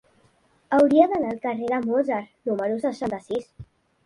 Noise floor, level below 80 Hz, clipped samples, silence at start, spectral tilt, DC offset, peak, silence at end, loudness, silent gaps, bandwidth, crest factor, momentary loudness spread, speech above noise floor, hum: -62 dBFS; -60 dBFS; under 0.1%; 0.7 s; -7 dB/octave; under 0.1%; -4 dBFS; 0.4 s; -23 LUFS; none; 11 kHz; 20 dB; 12 LU; 39 dB; none